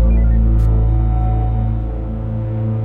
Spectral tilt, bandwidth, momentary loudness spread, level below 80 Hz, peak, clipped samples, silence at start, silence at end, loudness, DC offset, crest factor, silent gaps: -11.5 dB/octave; 2.6 kHz; 8 LU; -16 dBFS; -6 dBFS; under 0.1%; 0 s; 0 s; -18 LUFS; under 0.1%; 10 dB; none